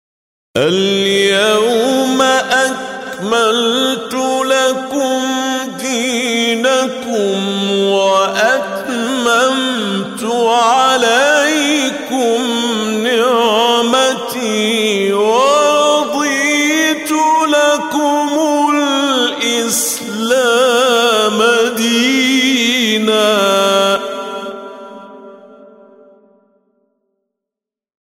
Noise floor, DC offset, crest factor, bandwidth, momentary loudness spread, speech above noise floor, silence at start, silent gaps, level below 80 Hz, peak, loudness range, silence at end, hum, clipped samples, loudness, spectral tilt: -85 dBFS; under 0.1%; 12 dB; 16 kHz; 7 LU; 73 dB; 0.55 s; none; -60 dBFS; -2 dBFS; 3 LU; 2.4 s; none; under 0.1%; -13 LUFS; -2.5 dB/octave